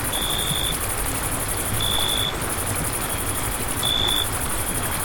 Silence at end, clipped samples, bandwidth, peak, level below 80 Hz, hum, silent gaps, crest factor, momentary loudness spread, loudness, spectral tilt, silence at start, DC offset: 0 s; under 0.1%; 19.5 kHz; -6 dBFS; -34 dBFS; none; none; 18 dB; 4 LU; -22 LUFS; -2 dB/octave; 0 s; under 0.1%